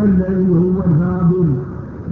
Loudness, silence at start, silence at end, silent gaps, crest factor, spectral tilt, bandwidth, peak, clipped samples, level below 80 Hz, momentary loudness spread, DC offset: -15 LUFS; 0 s; 0 s; none; 10 dB; -13 dB/octave; 2.3 kHz; -6 dBFS; under 0.1%; -34 dBFS; 10 LU; under 0.1%